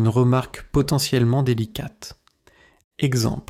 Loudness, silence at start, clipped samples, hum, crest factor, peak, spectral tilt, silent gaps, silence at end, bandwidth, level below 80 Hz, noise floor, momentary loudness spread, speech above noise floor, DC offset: -21 LUFS; 0 s; under 0.1%; none; 14 dB; -8 dBFS; -6 dB/octave; 2.84-2.91 s; 0.1 s; 16 kHz; -42 dBFS; -56 dBFS; 15 LU; 36 dB; under 0.1%